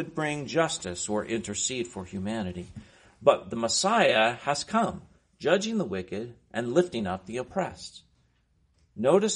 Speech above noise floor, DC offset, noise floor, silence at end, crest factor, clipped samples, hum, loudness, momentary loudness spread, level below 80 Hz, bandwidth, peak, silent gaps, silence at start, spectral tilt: 40 dB; under 0.1%; -68 dBFS; 0 s; 24 dB; under 0.1%; none; -28 LUFS; 14 LU; -60 dBFS; 10.5 kHz; -4 dBFS; none; 0 s; -3.5 dB/octave